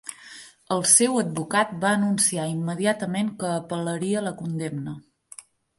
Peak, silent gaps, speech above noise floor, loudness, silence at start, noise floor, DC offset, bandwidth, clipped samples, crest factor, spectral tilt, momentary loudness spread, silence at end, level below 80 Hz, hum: -4 dBFS; none; 24 dB; -23 LUFS; 0.05 s; -48 dBFS; under 0.1%; 12 kHz; under 0.1%; 22 dB; -3.5 dB/octave; 25 LU; 0.35 s; -68 dBFS; none